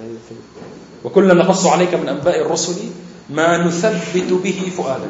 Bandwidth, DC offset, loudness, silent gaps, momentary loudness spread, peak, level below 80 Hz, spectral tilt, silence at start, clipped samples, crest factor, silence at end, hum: 8.2 kHz; under 0.1%; -16 LUFS; none; 23 LU; 0 dBFS; -58 dBFS; -5 dB/octave; 0 s; under 0.1%; 16 dB; 0 s; none